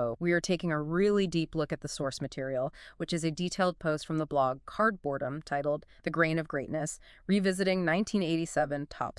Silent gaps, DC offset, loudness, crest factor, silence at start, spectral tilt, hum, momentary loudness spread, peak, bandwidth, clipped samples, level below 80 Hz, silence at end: none; under 0.1%; -31 LUFS; 18 dB; 0 s; -5.5 dB/octave; none; 7 LU; -12 dBFS; 12 kHz; under 0.1%; -58 dBFS; 0.1 s